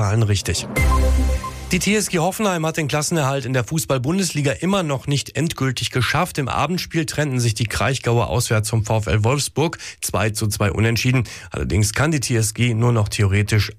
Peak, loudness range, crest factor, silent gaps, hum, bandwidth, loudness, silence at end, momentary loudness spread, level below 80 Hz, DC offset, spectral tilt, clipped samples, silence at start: -8 dBFS; 1 LU; 12 dB; none; none; 15.5 kHz; -20 LUFS; 0 s; 4 LU; -30 dBFS; under 0.1%; -5 dB/octave; under 0.1%; 0 s